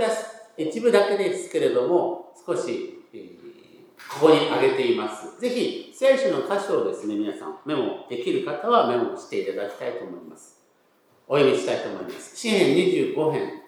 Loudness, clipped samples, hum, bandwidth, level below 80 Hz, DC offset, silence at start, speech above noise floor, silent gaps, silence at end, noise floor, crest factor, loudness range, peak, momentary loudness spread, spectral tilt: -23 LUFS; under 0.1%; none; 13.5 kHz; -84 dBFS; under 0.1%; 0 s; 39 dB; none; 0.05 s; -62 dBFS; 22 dB; 4 LU; -2 dBFS; 15 LU; -5 dB/octave